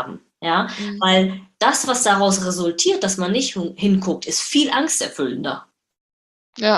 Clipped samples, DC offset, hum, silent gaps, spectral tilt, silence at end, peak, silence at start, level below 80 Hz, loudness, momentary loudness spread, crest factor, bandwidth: under 0.1%; under 0.1%; none; 6.01-6.53 s; -3 dB/octave; 0 s; -2 dBFS; 0 s; -60 dBFS; -19 LUFS; 9 LU; 18 dB; 12.5 kHz